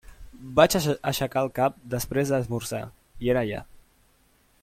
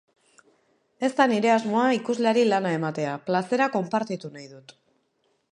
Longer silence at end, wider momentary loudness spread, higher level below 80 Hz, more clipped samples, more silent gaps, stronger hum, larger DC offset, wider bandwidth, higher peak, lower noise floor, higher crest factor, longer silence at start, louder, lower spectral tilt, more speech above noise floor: about the same, 1 s vs 0.95 s; about the same, 14 LU vs 12 LU; first, -50 dBFS vs -78 dBFS; neither; neither; neither; neither; first, 16.5 kHz vs 10.5 kHz; first, -2 dBFS vs -6 dBFS; second, -63 dBFS vs -71 dBFS; about the same, 24 dB vs 20 dB; second, 0.05 s vs 1 s; about the same, -25 LUFS vs -24 LUFS; about the same, -5 dB/octave vs -5.5 dB/octave; second, 38 dB vs 47 dB